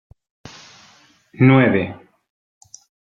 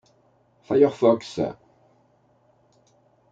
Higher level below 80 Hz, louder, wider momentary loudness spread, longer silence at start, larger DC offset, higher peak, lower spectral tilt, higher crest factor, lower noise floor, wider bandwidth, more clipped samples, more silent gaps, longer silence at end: first, -58 dBFS vs -68 dBFS; first, -16 LUFS vs -22 LUFS; first, 27 LU vs 11 LU; first, 1.4 s vs 0.7 s; neither; first, -2 dBFS vs -6 dBFS; about the same, -8 dB/octave vs -7 dB/octave; about the same, 20 dB vs 20 dB; second, -53 dBFS vs -62 dBFS; about the same, 7.6 kHz vs 7.8 kHz; neither; neither; second, 1.2 s vs 1.8 s